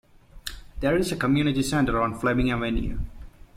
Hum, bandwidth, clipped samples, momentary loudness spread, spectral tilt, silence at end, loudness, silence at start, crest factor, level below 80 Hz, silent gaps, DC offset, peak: none; 16 kHz; under 0.1%; 15 LU; -6 dB/octave; 0.25 s; -25 LUFS; 0.35 s; 16 dB; -36 dBFS; none; under 0.1%; -10 dBFS